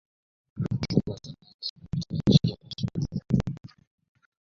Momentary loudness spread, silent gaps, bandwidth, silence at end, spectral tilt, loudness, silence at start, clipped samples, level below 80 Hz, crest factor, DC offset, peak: 18 LU; 1.54-1.59 s, 1.70-1.76 s; 7.4 kHz; 0.8 s; -7.5 dB/octave; -28 LUFS; 0.55 s; under 0.1%; -48 dBFS; 24 dB; under 0.1%; -4 dBFS